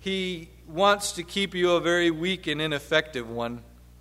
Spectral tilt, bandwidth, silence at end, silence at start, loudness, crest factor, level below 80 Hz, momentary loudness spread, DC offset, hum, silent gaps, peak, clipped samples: -4 dB/octave; 16 kHz; 0.4 s; 0 s; -25 LUFS; 20 dB; -52 dBFS; 12 LU; under 0.1%; 60 Hz at -50 dBFS; none; -6 dBFS; under 0.1%